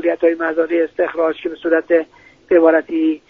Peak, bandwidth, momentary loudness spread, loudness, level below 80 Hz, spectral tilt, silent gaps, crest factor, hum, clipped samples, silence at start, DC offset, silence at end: 0 dBFS; 4.2 kHz; 7 LU; -16 LUFS; -58 dBFS; -7 dB/octave; none; 16 dB; none; under 0.1%; 0 s; under 0.1%; 0.1 s